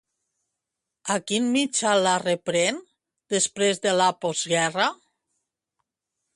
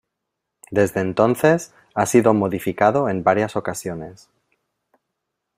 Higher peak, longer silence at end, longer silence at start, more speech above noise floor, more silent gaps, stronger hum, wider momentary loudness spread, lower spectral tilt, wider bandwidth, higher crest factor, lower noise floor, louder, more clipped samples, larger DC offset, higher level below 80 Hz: second, -8 dBFS vs -2 dBFS; about the same, 1.4 s vs 1.4 s; first, 1.05 s vs 0.7 s; about the same, 61 dB vs 61 dB; neither; neither; second, 7 LU vs 13 LU; second, -2.5 dB/octave vs -6 dB/octave; second, 11.5 kHz vs 16 kHz; about the same, 18 dB vs 20 dB; first, -85 dBFS vs -80 dBFS; second, -23 LUFS vs -19 LUFS; neither; neither; second, -72 dBFS vs -58 dBFS